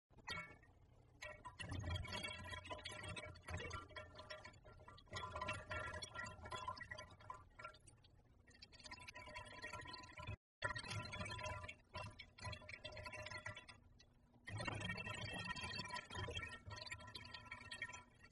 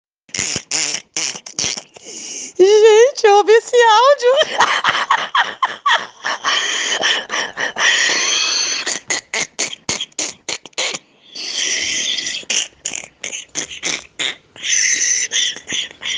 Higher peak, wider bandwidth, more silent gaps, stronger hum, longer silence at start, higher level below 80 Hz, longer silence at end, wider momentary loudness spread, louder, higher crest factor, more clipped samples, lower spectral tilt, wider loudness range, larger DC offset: second, -30 dBFS vs 0 dBFS; about the same, 11.5 kHz vs 11 kHz; first, 10.37-10.62 s vs none; neither; second, 0.1 s vs 0.35 s; second, -66 dBFS vs -60 dBFS; about the same, 0 s vs 0 s; second, 11 LU vs 14 LU; second, -51 LUFS vs -16 LUFS; about the same, 22 dB vs 18 dB; neither; first, -3.5 dB/octave vs 0 dB/octave; about the same, 6 LU vs 8 LU; neither